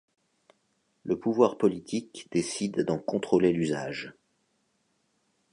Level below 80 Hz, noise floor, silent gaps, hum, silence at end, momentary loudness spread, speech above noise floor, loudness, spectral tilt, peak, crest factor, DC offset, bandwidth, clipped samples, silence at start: -64 dBFS; -73 dBFS; none; none; 1.4 s; 12 LU; 46 dB; -28 LUFS; -5.5 dB/octave; -8 dBFS; 22 dB; under 0.1%; 11 kHz; under 0.1%; 1.05 s